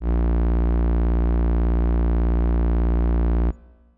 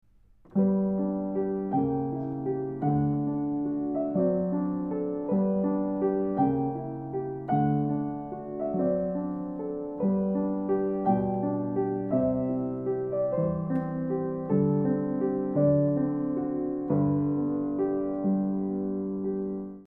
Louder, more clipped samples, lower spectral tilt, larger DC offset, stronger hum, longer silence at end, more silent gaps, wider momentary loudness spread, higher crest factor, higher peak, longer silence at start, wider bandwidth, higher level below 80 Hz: first, -22 LUFS vs -28 LUFS; neither; second, -12 dB/octave vs -13.5 dB/octave; neither; first, 60 Hz at -60 dBFS vs none; first, 0.4 s vs 0 s; neither; second, 1 LU vs 6 LU; second, 4 dB vs 14 dB; second, -16 dBFS vs -12 dBFS; second, 0 s vs 0.5 s; about the same, 3 kHz vs 2.9 kHz; first, -20 dBFS vs -56 dBFS